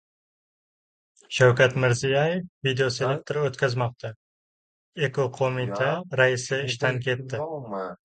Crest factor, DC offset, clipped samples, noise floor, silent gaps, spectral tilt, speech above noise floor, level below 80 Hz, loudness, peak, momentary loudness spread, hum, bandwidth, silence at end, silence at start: 22 dB; under 0.1%; under 0.1%; under -90 dBFS; 2.49-2.61 s, 4.16-4.92 s; -5 dB/octave; over 66 dB; -62 dBFS; -24 LUFS; -4 dBFS; 12 LU; none; 9.2 kHz; 0.1 s; 1.3 s